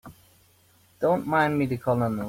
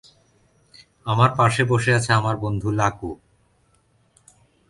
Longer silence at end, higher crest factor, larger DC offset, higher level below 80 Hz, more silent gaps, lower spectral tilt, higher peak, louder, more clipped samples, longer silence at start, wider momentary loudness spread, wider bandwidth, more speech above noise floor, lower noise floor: second, 0 s vs 1.55 s; about the same, 16 dB vs 20 dB; neither; second, -58 dBFS vs -50 dBFS; neither; first, -7.5 dB/octave vs -5.5 dB/octave; second, -10 dBFS vs -2 dBFS; second, -25 LUFS vs -20 LUFS; neither; second, 0.05 s vs 1.05 s; second, 3 LU vs 17 LU; first, 16.5 kHz vs 11.5 kHz; second, 36 dB vs 42 dB; about the same, -60 dBFS vs -62 dBFS